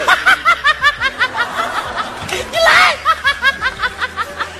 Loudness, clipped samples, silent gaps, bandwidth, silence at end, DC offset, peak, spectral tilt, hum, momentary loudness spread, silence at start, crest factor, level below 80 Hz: -14 LUFS; under 0.1%; none; 14.5 kHz; 0 s; under 0.1%; 0 dBFS; -1.5 dB/octave; none; 11 LU; 0 s; 16 dB; -42 dBFS